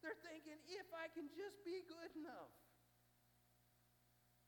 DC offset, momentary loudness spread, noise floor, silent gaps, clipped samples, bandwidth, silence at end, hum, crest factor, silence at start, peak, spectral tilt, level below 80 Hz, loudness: under 0.1%; 6 LU; -78 dBFS; none; under 0.1%; 19 kHz; 0 s; 60 Hz at -80 dBFS; 18 dB; 0 s; -38 dBFS; -4 dB/octave; -88 dBFS; -54 LUFS